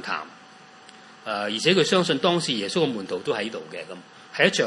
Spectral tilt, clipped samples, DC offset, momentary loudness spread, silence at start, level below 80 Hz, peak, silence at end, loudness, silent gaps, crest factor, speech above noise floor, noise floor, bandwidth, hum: -4 dB/octave; under 0.1%; under 0.1%; 18 LU; 0 s; -74 dBFS; -4 dBFS; 0 s; -23 LUFS; none; 22 dB; 25 dB; -48 dBFS; 11.5 kHz; none